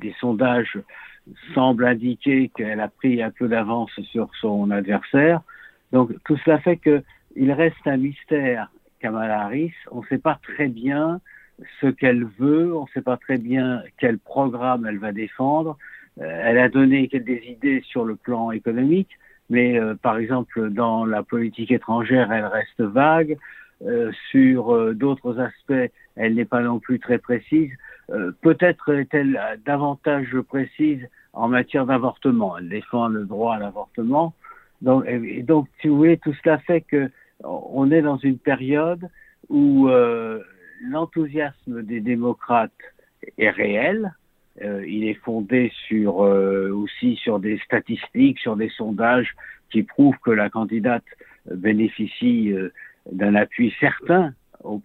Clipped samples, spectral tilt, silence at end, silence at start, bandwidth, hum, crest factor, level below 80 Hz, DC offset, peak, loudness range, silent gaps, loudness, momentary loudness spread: under 0.1%; -9.5 dB/octave; 0.05 s; 0 s; 4.1 kHz; none; 18 dB; -62 dBFS; under 0.1%; -2 dBFS; 3 LU; none; -21 LUFS; 11 LU